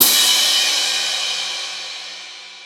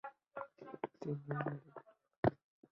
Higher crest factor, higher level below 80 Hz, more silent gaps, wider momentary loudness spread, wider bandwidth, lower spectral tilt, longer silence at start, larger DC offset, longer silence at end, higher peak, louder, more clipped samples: second, 18 dB vs 26 dB; second, -78 dBFS vs -68 dBFS; second, none vs 2.17-2.23 s; first, 19 LU vs 13 LU; first, over 20 kHz vs 6.6 kHz; second, 2.5 dB/octave vs -7.5 dB/octave; about the same, 0 s vs 0.05 s; neither; second, 0 s vs 0.4 s; first, 0 dBFS vs -18 dBFS; first, -15 LUFS vs -43 LUFS; neither